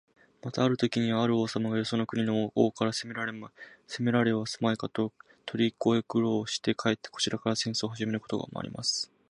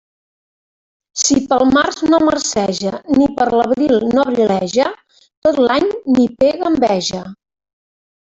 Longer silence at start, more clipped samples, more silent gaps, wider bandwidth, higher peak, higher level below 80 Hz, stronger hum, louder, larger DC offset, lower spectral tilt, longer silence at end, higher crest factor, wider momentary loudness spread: second, 0.45 s vs 1.15 s; neither; second, none vs 5.37-5.42 s; first, 11.5 kHz vs 8 kHz; second, -10 dBFS vs -2 dBFS; second, -68 dBFS vs -48 dBFS; neither; second, -29 LUFS vs -15 LUFS; neither; about the same, -5 dB/octave vs -4 dB/octave; second, 0.25 s vs 0.95 s; first, 20 dB vs 14 dB; first, 9 LU vs 6 LU